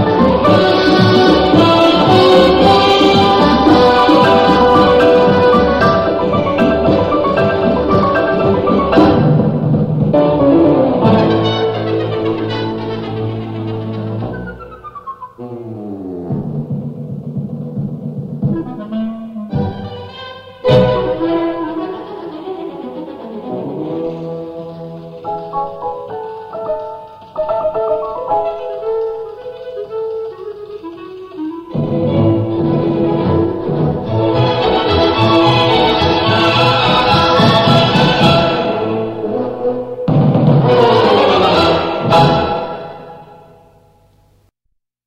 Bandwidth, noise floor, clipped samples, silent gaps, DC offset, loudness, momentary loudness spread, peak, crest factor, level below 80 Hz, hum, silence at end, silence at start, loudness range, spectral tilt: 12 kHz; -67 dBFS; under 0.1%; none; under 0.1%; -13 LUFS; 18 LU; 0 dBFS; 14 dB; -36 dBFS; none; 1.7 s; 0 s; 15 LU; -7 dB/octave